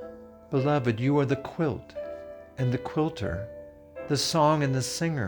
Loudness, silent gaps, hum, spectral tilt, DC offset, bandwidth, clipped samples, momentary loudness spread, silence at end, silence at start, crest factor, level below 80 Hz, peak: -27 LUFS; none; none; -5.5 dB/octave; under 0.1%; 20 kHz; under 0.1%; 20 LU; 0 s; 0 s; 18 dB; -54 dBFS; -10 dBFS